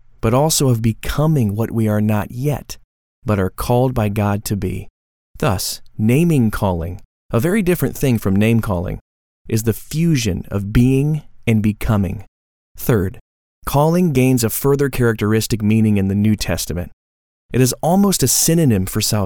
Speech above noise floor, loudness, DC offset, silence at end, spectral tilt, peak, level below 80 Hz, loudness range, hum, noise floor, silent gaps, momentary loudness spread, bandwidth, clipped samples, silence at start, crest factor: over 74 dB; -17 LUFS; under 0.1%; 0 s; -5.5 dB/octave; 0 dBFS; -36 dBFS; 3 LU; none; under -90 dBFS; 2.84-3.22 s, 4.90-5.34 s, 7.05-7.29 s, 9.01-9.45 s, 12.28-12.75 s, 13.21-13.62 s, 16.93-17.49 s; 10 LU; over 20 kHz; under 0.1%; 0.25 s; 16 dB